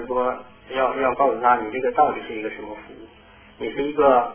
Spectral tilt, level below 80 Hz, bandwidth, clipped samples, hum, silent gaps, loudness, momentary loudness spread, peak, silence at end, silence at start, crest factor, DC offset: -8.5 dB/octave; -54 dBFS; 3.5 kHz; under 0.1%; none; none; -22 LUFS; 16 LU; -4 dBFS; 0 s; 0 s; 18 dB; under 0.1%